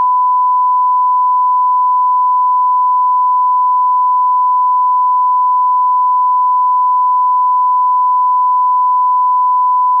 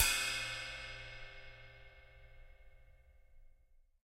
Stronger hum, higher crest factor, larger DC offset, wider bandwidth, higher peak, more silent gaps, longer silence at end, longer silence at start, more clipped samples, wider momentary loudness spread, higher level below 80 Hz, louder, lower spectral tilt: neither; second, 4 dB vs 28 dB; neither; second, 1.1 kHz vs 16 kHz; first, -8 dBFS vs -14 dBFS; neither; second, 0 s vs 0.25 s; about the same, 0 s vs 0 s; neither; second, 0 LU vs 26 LU; second, under -90 dBFS vs -56 dBFS; first, -11 LUFS vs -39 LUFS; about the same, 1.5 dB/octave vs 0.5 dB/octave